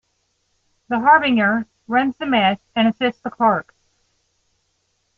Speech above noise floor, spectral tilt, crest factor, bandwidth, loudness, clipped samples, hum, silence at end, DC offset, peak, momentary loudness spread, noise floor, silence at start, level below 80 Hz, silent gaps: 51 dB; -7 dB/octave; 20 dB; 6.2 kHz; -18 LUFS; under 0.1%; none; 1.55 s; under 0.1%; -2 dBFS; 9 LU; -69 dBFS; 0.9 s; -62 dBFS; none